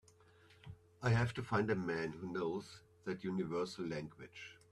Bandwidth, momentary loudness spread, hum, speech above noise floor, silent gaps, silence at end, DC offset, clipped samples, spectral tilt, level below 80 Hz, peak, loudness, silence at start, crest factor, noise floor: 12 kHz; 20 LU; none; 27 dB; none; 0.15 s; under 0.1%; under 0.1%; -7 dB/octave; -66 dBFS; -22 dBFS; -39 LUFS; 0.5 s; 18 dB; -66 dBFS